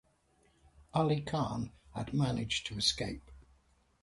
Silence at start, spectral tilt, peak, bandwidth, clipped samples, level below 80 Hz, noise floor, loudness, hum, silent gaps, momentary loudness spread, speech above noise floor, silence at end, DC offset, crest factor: 0.8 s; -5 dB/octave; -16 dBFS; 11.5 kHz; under 0.1%; -56 dBFS; -71 dBFS; -34 LUFS; none; none; 11 LU; 37 dB; 0.6 s; under 0.1%; 20 dB